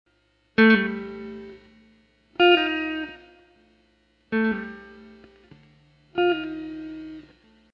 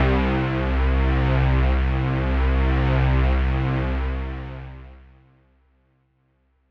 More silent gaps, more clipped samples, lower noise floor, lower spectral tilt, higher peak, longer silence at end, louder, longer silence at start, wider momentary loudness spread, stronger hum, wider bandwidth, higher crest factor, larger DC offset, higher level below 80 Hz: neither; neither; about the same, -65 dBFS vs -65 dBFS; second, -7 dB/octave vs -9 dB/octave; first, -4 dBFS vs -8 dBFS; second, 0.5 s vs 1.75 s; about the same, -22 LUFS vs -22 LUFS; first, 0.6 s vs 0 s; first, 23 LU vs 13 LU; neither; first, 5.8 kHz vs 5.2 kHz; first, 22 dB vs 14 dB; neither; second, -60 dBFS vs -24 dBFS